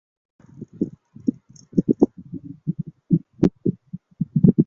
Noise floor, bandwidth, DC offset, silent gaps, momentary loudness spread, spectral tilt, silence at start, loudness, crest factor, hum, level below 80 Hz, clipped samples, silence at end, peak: -40 dBFS; 7 kHz; under 0.1%; none; 19 LU; -11 dB/octave; 0.6 s; -24 LUFS; 22 dB; none; -50 dBFS; under 0.1%; 0.05 s; -2 dBFS